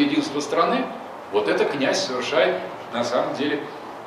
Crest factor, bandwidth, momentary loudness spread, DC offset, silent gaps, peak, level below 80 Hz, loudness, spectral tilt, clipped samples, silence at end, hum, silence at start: 18 dB; 14.5 kHz; 9 LU; under 0.1%; none; -6 dBFS; -68 dBFS; -23 LUFS; -4 dB/octave; under 0.1%; 0 s; none; 0 s